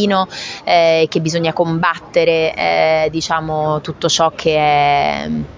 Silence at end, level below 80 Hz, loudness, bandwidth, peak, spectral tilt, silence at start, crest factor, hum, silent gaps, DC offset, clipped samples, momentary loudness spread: 0 s; -44 dBFS; -15 LUFS; 7.6 kHz; 0 dBFS; -4.5 dB/octave; 0 s; 14 dB; none; none; under 0.1%; under 0.1%; 6 LU